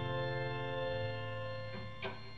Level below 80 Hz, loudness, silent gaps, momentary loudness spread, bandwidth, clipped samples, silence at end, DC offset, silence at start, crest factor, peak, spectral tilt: -60 dBFS; -40 LUFS; none; 6 LU; 7.2 kHz; under 0.1%; 0 s; 0.4%; 0 s; 14 dB; -26 dBFS; -7.5 dB/octave